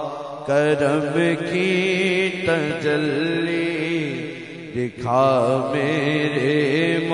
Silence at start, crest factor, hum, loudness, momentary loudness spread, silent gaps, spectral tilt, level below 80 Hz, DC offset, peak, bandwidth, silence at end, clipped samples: 0 s; 16 dB; none; -21 LUFS; 9 LU; none; -6 dB/octave; -60 dBFS; under 0.1%; -6 dBFS; 10.5 kHz; 0 s; under 0.1%